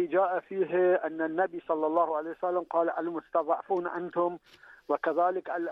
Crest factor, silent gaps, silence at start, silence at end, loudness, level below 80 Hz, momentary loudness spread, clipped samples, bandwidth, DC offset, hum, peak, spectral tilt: 16 dB; none; 0 s; 0 s; -29 LUFS; -76 dBFS; 6 LU; under 0.1%; 5 kHz; under 0.1%; none; -14 dBFS; -8.5 dB/octave